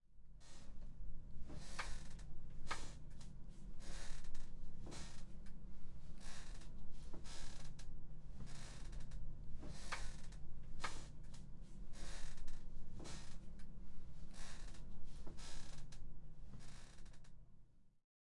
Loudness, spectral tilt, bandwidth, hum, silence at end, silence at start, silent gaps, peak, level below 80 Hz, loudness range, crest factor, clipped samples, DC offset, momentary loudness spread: -56 LUFS; -4 dB/octave; 11 kHz; none; 0.4 s; 0.1 s; none; -28 dBFS; -50 dBFS; 4 LU; 12 dB; under 0.1%; under 0.1%; 10 LU